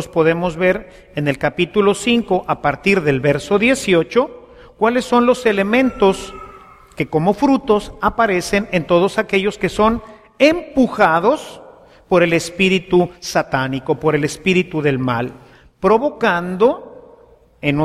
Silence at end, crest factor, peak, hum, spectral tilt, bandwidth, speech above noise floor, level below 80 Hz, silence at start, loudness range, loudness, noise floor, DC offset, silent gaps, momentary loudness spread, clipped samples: 0 s; 16 dB; 0 dBFS; none; -5.5 dB/octave; 15 kHz; 32 dB; -44 dBFS; 0 s; 2 LU; -16 LUFS; -48 dBFS; under 0.1%; none; 7 LU; under 0.1%